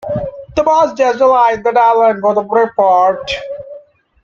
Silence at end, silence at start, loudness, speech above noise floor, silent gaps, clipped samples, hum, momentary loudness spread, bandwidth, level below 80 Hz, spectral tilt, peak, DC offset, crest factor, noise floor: 0.45 s; 0.05 s; -12 LUFS; 28 dB; none; under 0.1%; none; 11 LU; 7.6 kHz; -46 dBFS; -5 dB/octave; 0 dBFS; under 0.1%; 12 dB; -39 dBFS